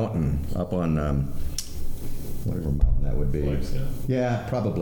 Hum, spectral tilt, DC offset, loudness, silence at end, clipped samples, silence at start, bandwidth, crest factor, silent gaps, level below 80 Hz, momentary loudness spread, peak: none; -7 dB/octave; under 0.1%; -28 LUFS; 0 s; under 0.1%; 0 s; 19 kHz; 16 dB; none; -28 dBFS; 10 LU; -8 dBFS